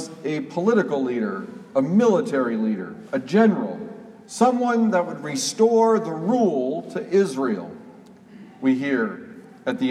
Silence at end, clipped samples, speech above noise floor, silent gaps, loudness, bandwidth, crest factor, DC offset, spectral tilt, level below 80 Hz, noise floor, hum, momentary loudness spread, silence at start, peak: 0 s; under 0.1%; 25 dB; none; -22 LUFS; 13.5 kHz; 18 dB; under 0.1%; -5.5 dB/octave; -74 dBFS; -46 dBFS; none; 13 LU; 0 s; -4 dBFS